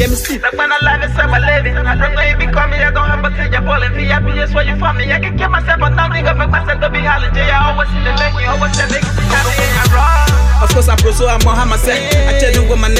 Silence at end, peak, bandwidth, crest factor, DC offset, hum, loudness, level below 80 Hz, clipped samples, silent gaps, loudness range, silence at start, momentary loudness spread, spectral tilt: 0 s; 0 dBFS; 15.5 kHz; 10 dB; under 0.1%; none; -12 LUFS; -14 dBFS; under 0.1%; none; 2 LU; 0 s; 4 LU; -4.5 dB/octave